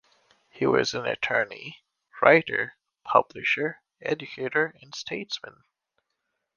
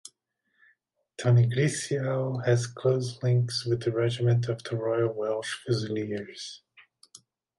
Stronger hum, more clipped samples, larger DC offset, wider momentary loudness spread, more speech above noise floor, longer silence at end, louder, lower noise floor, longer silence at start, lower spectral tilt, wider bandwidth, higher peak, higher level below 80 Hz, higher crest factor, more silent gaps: neither; neither; neither; first, 16 LU vs 11 LU; first, 55 dB vs 49 dB; about the same, 1.05 s vs 1 s; about the same, -25 LUFS vs -27 LUFS; first, -80 dBFS vs -76 dBFS; second, 0.55 s vs 1.2 s; second, -4.5 dB/octave vs -6 dB/octave; second, 7.2 kHz vs 11.5 kHz; first, -2 dBFS vs -12 dBFS; about the same, -68 dBFS vs -66 dBFS; first, 26 dB vs 16 dB; neither